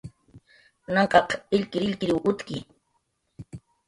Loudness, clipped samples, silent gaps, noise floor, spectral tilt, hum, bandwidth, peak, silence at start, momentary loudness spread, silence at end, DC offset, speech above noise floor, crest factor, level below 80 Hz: -24 LUFS; under 0.1%; none; -73 dBFS; -6 dB/octave; none; 11.5 kHz; -4 dBFS; 0.05 s; 24 LU; 0.3 s; under 0.1%; 49 dB; 24 dB; -58 dBFS